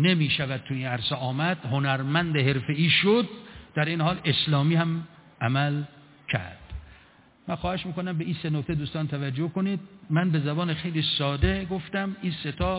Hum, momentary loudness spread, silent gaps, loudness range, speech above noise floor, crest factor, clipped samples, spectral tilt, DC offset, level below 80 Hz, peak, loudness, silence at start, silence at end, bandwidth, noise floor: none; 11 LU; none; 7 LU; 30 dB; 18 dB; under 0.1%; -10 dB/octave; under 0.1%; -44 dBFS; -8 dBFS; -26 LUFS; 0 s; 0 s; 4 kHz; -56 dBFS